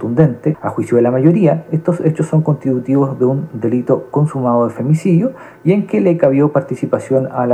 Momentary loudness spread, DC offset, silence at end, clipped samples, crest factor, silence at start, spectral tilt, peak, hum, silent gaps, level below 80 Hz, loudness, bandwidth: 7 LU; under 0.1%; 0 s; under 0.1%; 14 dB; 0 s; -9.5 dB/octave; 0 dBFS; none; none; -56 dBFS; -15 LUFS; 9.4 kHz